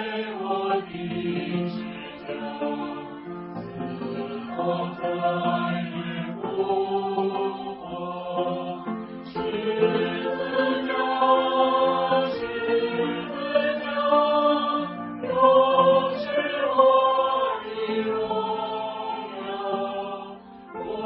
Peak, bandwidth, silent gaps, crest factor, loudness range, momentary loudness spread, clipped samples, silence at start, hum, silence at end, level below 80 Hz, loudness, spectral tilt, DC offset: -4 dBFS; 5.6 kHz; none; 20 dB; 9 LU; 14 LU; under 0.1%; 0 s; none; 0 s; -62 dBFS; -25 LUFS; -3.5 dB/octave; under 0.1%